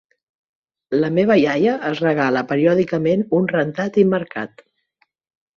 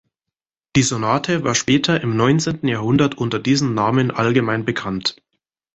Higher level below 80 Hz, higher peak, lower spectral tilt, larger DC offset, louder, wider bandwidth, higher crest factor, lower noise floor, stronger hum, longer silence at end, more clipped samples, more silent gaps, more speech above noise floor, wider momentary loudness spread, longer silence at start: second, -60 dBFS vs -50 dBFS; about the same, -2 dBFS vs -2 dBFS; first, -7.5 dB/octave vs -5 dB/octave; neither; about the same, -18 LUFS vs -18 LUFS; second, 7 kHz vs 8.2 kHz; about the same, 16 dB vs 16 dB; second, -66 dBFS vs -85 dBFS; neither; first, 1.1 s vs 0.6 s; neither; neither; second, 48 dB vs 67 dB; first, 8 LU vs 5 LU; first, 0.9 s vs 0.75 s